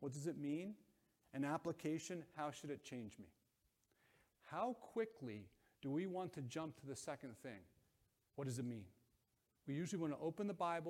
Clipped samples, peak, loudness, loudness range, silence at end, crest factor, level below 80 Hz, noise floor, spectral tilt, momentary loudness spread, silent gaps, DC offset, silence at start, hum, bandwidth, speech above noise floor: under 0.1%; -30 dBFS; -48 LUFS; 3 LU; 0 s; 18 dB; -84 dBFS; -84 dBFS; -6 dB/octave; 13 LU; none; under 0.1%; 0 s; none; 16.5 kHz; 38 dB